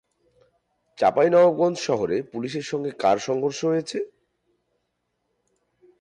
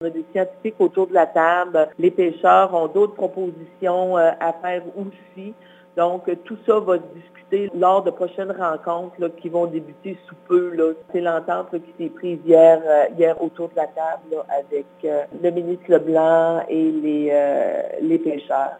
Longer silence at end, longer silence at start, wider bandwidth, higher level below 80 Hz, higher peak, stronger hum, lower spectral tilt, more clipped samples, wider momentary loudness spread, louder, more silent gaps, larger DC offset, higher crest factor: first, 1.95 s vs 0 s; first, 1 s vs 0 s; first, 10 kHz vs 9 kHz; first, -66 dBFS vs -74 dBFS; second, -8 dBFS vs 0 dBFS; first, 60 Hz at -60 dBFS vs none; second, -5.5 dB/octave vs -7.5 dB/octave; neither; about the same, 13 LU vs 13 LU; second, -23 LUFS vs -20 LUFS; neither; neither; about the same, 16 dB vs 18 dB